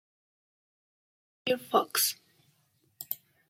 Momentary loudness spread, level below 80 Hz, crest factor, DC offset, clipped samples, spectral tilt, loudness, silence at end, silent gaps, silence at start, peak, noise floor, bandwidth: 16 LU; -86 dBFS; 24 dB; under 0.1%; under 0.1%; -1 dB/octave; -30 LUFS; 0.35 s; none; 1.45 s; -10 dBFS; -71 dBFS; 16.5 kHz